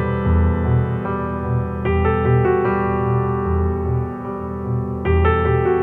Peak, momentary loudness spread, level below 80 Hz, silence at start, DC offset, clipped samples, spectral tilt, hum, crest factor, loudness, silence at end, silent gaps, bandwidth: -4 dBFS; 7 LU; -32 dBFS; 0 s; under 0.1%; under 0.1%; -10.5 dB/octave; none; 14 dB; -19 LUFS; 0 s; none; 3.8 kHz